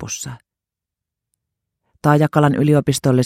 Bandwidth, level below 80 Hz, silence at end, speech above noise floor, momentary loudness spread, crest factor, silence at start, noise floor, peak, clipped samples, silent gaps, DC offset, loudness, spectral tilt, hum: 15 kHz; -52 dBFS; 0 s; 70 dB; 13 LU; 18 dB; 0 s; -86 dBFS; 0 dBFS; under 0.1%; none; under 0.1%; -16 LUFS; -6 dB/octave; none